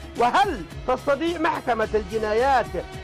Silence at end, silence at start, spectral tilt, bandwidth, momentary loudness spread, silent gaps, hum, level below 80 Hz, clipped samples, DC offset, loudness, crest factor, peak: 0 s; 0 s; -5 dB/octave; 15.5 kHz; 6 LU; none; none; -42 dBFS; under 0.1%; under 0.1%; -23 LUFS; 10 dB; -12 dBFS